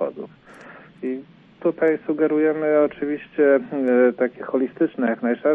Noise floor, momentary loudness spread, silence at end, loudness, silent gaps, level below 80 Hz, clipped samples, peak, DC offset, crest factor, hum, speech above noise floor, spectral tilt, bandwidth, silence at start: -44 dBFS; 12 LU; 0 s; -21 LUFS; none; -68 dBFS; under 0.1%; -6 dBFS; under 0.1%; 16 dB; none; 24 dB; -9 dB/octave; 3.9 kHz; 0 s